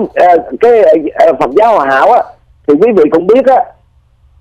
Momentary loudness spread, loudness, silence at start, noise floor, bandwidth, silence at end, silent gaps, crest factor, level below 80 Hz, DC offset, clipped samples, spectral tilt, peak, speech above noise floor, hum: 5 LU; -8 LUFS; 0 s; -47 dBFS; 9 kHz; 0.7 s; none; 8 dB; -46 dBFS; under 0.1%; under 0.1%; -6.5 dB/octave; 0 dBFS; 40 dB; none